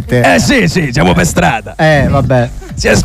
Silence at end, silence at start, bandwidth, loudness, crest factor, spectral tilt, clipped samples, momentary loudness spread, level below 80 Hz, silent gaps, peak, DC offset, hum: 0 s; 0 s; 15.5 kHz; -10 LUFS; 10 dB; -5 dB/octave; under 0.1%; 5 LU; -24 dBFS; none; 0 dBFS; under 0.1%; none